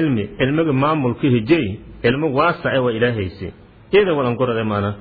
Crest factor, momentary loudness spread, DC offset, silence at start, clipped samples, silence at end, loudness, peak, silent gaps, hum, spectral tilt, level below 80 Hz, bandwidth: 16 dB; 7 LU; under 0.1%; 0 s; under 0.1%; 0 s; -18 LUFS; -2 dBFS; none; none; -10.5 dB/octave; -46 dBFS; 4.9 kHz